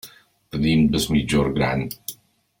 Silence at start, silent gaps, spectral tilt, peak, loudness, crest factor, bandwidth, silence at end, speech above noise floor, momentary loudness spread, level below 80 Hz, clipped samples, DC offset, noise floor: 0.05 s; none; -5.5 dB/octave; -6 dBFS; -21 LUFS; 16 dB; 17 kHz; 0.45 s; 29 dB; 14 LU; -40 dBFS; under 0.1%; under 0.1%; -49 dBFS